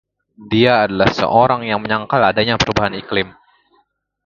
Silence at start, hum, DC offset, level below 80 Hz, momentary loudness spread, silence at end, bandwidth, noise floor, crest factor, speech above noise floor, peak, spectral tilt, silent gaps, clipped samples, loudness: 0.4 s; none; under 0.1%; -42 dBFS; 7 LU; 1 s; 7.4 kHz; -61 dBFS; 16 dB; 45 dB; 0 dBFS; -5.5 dB/octave; none; under 0.1%; -15 LUFS